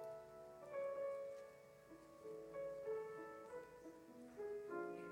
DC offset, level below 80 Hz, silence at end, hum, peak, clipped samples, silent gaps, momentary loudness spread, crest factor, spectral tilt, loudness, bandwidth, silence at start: under 0.1%; -84 dBFS; 0 s; none; -36 dBFS; under 0.1%; none; 13 LU; 14 dB; -6 dB/octave; -51 LUFS; 17 kHz; 0 s